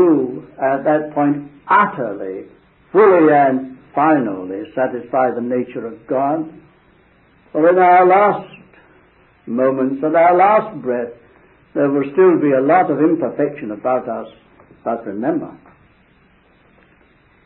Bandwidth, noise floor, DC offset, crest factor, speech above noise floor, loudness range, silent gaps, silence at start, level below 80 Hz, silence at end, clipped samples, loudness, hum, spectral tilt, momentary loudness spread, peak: 4.2 kHz; -53 dBFS; under 0.1%; 16 dB; 38 dB; 7 LU; none; 0 s; -60 dBFS; 1.9 s; under 0.1%; -16 LUFS; none; -12 dB/octave; 15 LU; 0 dBFS